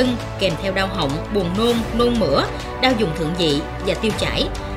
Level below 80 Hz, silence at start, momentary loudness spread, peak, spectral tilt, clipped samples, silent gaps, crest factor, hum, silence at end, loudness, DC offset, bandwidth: -32 dBFS; 0 s; 4 LU; -2 dBFS; -5.5 dB/octave; under 0.1%; none; 18 dB; none; 0 s; -20 LUFS; under 0.1%; 16 kHz